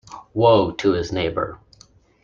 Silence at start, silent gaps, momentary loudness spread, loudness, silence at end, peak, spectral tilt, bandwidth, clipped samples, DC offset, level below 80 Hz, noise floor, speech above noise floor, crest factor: 0.1 s; none; 13 LU; -20 LUFS; 0.65 s; -2 dBFS; -6.5 dB/octave; 7.6 kHz; under 0.1%; under 0.1%; -48 dBFS; -52 dBFS; 34 dB; 18 dB